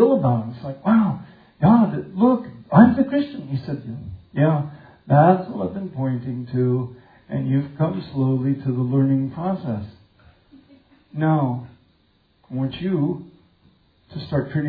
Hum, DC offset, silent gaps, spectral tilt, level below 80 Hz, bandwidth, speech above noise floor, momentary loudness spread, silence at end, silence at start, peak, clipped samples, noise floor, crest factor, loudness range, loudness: none; under 0.1%; none; -12 dB/octave; -56 dBFS; 4.9 kHz; 40 dB; 16 LU; 0 s; 0 s; 0 dBFS; under 0.1%; -61 dBFS; 20 dB; 8 LU; -21 LUFS